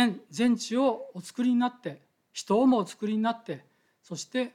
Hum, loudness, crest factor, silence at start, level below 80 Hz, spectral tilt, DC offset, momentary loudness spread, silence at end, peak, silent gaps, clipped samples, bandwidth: none; -27 LUFS; 16 dB; 0 s; -76 dBFS; -5 dB/octave; under 0.1%; 16 LU; 0.05 s; -12 dBFS; none; under 0.1%; 12.5 kHz